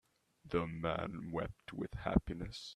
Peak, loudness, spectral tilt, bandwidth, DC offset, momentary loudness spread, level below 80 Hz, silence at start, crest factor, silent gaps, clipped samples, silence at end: -16 dBFS; -40 LUFS; -7 dB/octave; 12 kHz; under 0.1%; 9 LU; -50 dBFS; 0.45 s; 24 dB; none; under 0.1%; 0 s